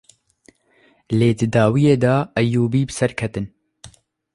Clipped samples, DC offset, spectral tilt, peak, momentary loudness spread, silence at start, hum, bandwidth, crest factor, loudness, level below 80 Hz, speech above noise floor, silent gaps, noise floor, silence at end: under 0.1%; under 0.1%; -7 dB/octave; -4 dBFS; 11 LU; 1.1 s; none; 11.5 kHz; 16 dB; -18 LUFS; -50 dBFS; 40 dB; none; -57 dBFS; 0.5 s